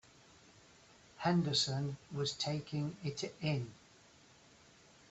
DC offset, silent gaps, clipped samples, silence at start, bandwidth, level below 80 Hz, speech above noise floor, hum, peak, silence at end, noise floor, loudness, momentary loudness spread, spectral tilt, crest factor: under 0.1%; none; under 0.1%; 1.15 s; 8.2 kHz; -70 dBFS; 27 dB; none; -20 dBFS; 1.35 s; -63 dBFS; -37 LUFS; 9 LU; -5 dB/octave; 20 dB